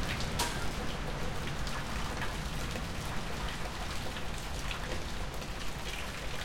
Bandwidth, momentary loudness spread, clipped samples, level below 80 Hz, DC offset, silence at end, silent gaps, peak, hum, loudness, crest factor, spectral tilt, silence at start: 17 kHz; 5 LU; under 0.1%; -42 dBFS; under 0.1%; 0 s; none; -18 dBFS; none; -37 LUFS; 18 dB; -4 dB/octave; 0 s